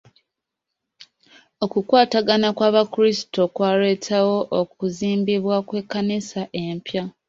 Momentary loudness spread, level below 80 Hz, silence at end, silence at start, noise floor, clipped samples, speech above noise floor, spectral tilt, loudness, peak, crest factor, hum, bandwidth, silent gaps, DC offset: 10 LU; -64 dBFS; 0.2 s; 1 s; -82 dBFS; under 0.1%; 62 dB; -5.5 dB/octave; -21 LUFS; -2 dBFS; 20 dB; none; 7.8 kHz; none; under 0.1%